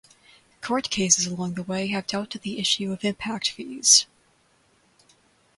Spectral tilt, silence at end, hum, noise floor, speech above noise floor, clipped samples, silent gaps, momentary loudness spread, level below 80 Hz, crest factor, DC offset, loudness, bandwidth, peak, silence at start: -2 dB/octave; 1.55 s; none; -63 dBFS; 38 dB; under 0.1%; none; 14 LU; -62 dBFS; 26 dB; under 0.1%; -23 LUFS; 11.5 kHz; -2 dBFS; 0.6 s